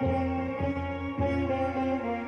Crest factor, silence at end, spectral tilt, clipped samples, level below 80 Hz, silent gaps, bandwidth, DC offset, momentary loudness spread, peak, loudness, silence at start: 12 dB; 0 s; -8.5 dB/octave; under 0.1%; -44 dBFS; none; 6.6 kHz; under 0.1%; 3 LU; -18 dBFS; -30 LUFS; 0 s